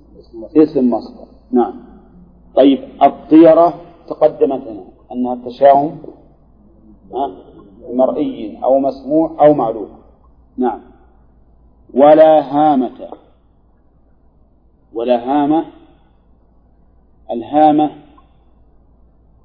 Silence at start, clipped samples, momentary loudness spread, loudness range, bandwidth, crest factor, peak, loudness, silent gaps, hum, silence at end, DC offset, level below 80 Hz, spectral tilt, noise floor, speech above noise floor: 0.35 s; under 0.1%; 21 LU; 8 LU; 5.2 kHz; 16 dB; 0 dBFS; -13 LUFS; none; none; 1.5 s; under 0.1%; -50 dBFS; -10 dB/octave; -51 dBFS; 38 dB